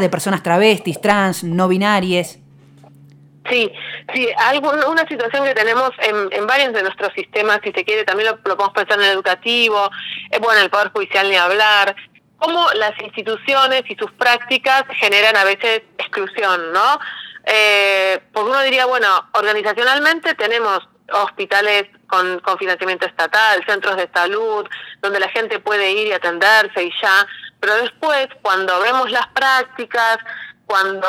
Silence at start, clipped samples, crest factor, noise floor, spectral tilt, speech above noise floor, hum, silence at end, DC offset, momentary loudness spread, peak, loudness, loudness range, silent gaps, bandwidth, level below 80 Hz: 0 s; under 0.1%; 16 dB; -45 dBFS; -3.5 dB/octave; 29 dB; none; 0 s; under 0.1%; 9 LU; 0 dBFS; -15 LUFS; 3 LU; none; 17.5 kHz; -66 dBFS